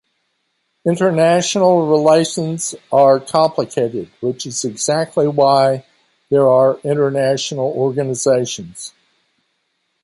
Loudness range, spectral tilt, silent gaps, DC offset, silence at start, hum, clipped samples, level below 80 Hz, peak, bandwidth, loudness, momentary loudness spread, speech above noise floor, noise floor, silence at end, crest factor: 3 LU; -5 dB/octave; none; under 0.1%; 0.85 s; none; under 0.1%; -62 dBFS; -2 dBFS; 11.5 kHz; -16 LUFS; 11 LU; 53 dB; -68 dBFS; 1.15 s; 14 dB